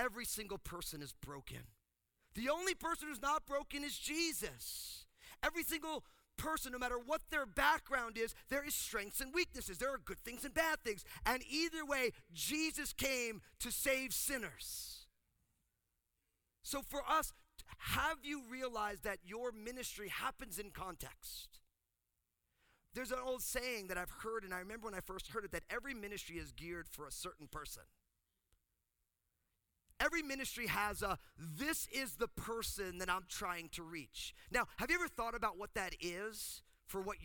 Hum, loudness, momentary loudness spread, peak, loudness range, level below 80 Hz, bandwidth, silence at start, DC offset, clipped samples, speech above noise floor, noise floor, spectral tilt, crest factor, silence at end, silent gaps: none; -41 LUFS; 11 LU; -20 dBFS; 8 LU; -60 dBFS; over 20 kHz; 0 s; under 0.1%; under 0.1%; 45 dB; -87 dBFS; -2.5 dB/octave; 24 dB; 0 s; none